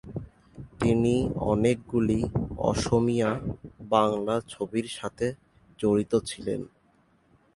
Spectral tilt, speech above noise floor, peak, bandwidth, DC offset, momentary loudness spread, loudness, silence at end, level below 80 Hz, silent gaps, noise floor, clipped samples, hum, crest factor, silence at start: -6.5 dB/octave; 38 dB; -6 dBFS; 11.5 kHz; under 0.1%; 15 LU; -27 LUFS; 0.9 s; -46 dBFS; none; -64 dBFS; under 0.1%; none; 22 dB; 0.05 s